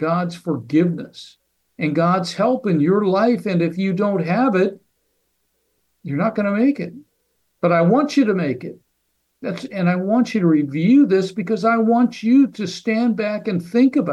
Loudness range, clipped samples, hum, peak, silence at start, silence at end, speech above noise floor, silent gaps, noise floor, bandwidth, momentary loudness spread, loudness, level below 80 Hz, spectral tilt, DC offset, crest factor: 4 LU; under 0.1%; none; -6 dBFS; 0 s; 0 s; 52 dB; none; -70 dBFS; 11.5 kHz; 11 LU; -18 LUFS; -68 dBFS; -7.5 dB/octave; under 0.1%; 12 dB